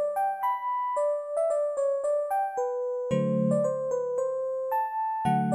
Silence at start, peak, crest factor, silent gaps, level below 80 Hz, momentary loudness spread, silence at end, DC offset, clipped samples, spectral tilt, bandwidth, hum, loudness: 0 s; -14 dBFS; 14 dB; none; -68 dBFS; 4 LU; 0 s; under 0.1%; under 0.1%; -7.5 dB/octave; 15.5 kHz; none; -28 LUFS